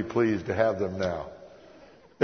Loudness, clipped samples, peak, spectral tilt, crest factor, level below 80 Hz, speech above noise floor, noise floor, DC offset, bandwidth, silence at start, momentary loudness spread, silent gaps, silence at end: -28 LUFS; under 0.1%; -8 dBFS; -7 dB/octave; 20 dB; -58 dBFS; 26 dB; -53 dBFS; under 0.1%; 6.4 kHz; 0 s; 15 LU; none; 0 s